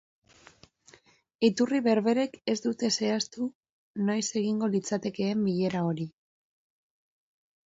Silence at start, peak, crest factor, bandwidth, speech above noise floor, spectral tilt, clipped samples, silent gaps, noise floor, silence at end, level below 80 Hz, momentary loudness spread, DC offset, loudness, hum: 1.4 s; -12 dBFS; 18 dB; 8 kHz; 33 dB; -5 dB/octave; under 0.1%; 3.55-3.61 s, 3.70-3.94 s; -61 dBFS; 1.55 s; -72 dBFS; 9 LU; under 0.1%; -28 LUFS; none